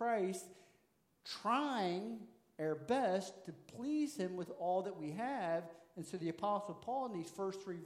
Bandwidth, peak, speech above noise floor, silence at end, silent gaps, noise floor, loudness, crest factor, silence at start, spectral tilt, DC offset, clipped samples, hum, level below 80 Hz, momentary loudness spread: 16 kHz; -24 dBFS; 36 dB; 0 s; none; -76 dBFS; -40 LUFS; 16 dB; 0 s; -5.5 dB/octave; under 0.1%; under 0.1%; none; -86 dBFS; 15 LU